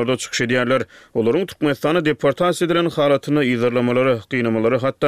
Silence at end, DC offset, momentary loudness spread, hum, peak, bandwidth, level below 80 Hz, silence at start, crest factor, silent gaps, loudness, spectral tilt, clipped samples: 0 s; 0.2%; 3 LU; none; -4 dBFS; 15 kHz; -56 dBFS; 0 s; 14 dB; none; -19 LUFS; -5.5 dB/octave; under 0.1%